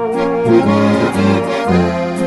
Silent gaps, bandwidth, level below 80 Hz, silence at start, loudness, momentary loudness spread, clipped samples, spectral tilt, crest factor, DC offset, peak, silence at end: none; 11.5 kHz; -42 dBFS; 0 s; -13 LUFS; 4 LU; under 0.1%; -7 dB/octave; 12 dB; under 0.1%; 0 dBFS; 0 s